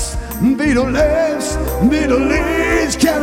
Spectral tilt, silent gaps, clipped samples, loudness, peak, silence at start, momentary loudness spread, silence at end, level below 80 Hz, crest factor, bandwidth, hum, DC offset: -5 dB/octave; none; under 0.1%; -15 LUFS; 0 dBFS; 0 s; 4 LU; 0 s; -26 dBFS; 14 dB; 16.5 kHz; none; under 0.1%